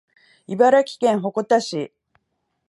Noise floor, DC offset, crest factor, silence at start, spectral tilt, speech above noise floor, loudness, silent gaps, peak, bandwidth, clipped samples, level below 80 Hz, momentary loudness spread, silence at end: -74 dBFS; under 0.1%; 18 dB; 0.5 s; -5 dB/octave; 55 dB; -19 LUFS; none; -4 dBFS; 11.5 kHz; under 0.1%; -74 dBFS; 15 LU; 0.8 s